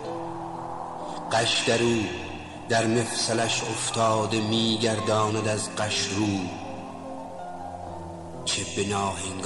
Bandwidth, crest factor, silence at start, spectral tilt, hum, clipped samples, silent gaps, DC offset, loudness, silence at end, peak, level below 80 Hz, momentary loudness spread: 12 kHz; 16 dB; 0 s; -3.5 dB/octave; none; under 0.1%; none; 0.3%; -26 LUFS; 0 s; -10 dBFS; -56 dBFS; 15 LU